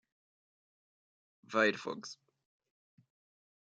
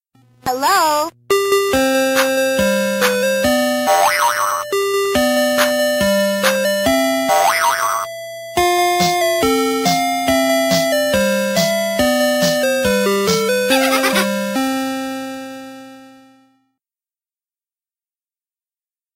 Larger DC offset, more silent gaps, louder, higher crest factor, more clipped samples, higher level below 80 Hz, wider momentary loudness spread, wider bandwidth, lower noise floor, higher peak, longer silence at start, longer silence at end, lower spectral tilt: neither; neither; second, -33 LUFS vs -15 LUFS; first, 26 dB vs 16 dB; neither; second, -90 dBFS vs -48 dBFS; first, 19 LU vs 6 LU; second, 9.2 kHz vs 16 kHz; about the same, under -90 dBFS vs under -90 dBFS; second, -14 dBFS vs 0 dBFS; first, 1.5 s vs 0.45 s; second, 1.55 s vs 3.1 s; about the same, -3.5 dB/octave vs -3 dB/octave